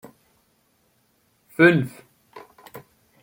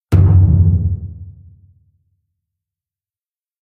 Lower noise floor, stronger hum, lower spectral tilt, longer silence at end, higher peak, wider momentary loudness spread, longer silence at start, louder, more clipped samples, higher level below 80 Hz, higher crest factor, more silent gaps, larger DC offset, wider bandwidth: second, -65 dBFS vs under -90 dBFS; neither; second, -7 dB/octave vs -10.5 dB/octave; second, 0.45 s vs 2.3 s; about the same, -4 dBFS vs -2 dBFS; first, 28 LU vs 21 LU; first, 1.6 s vs 0.1 s; second, -19 LUFS vs -13 LUFS; neither; second, -68 dBFS vs -26 dBFS; first, 22 dB vs 14 dB; neither; neither; first, 17 kHz vs 3 kHz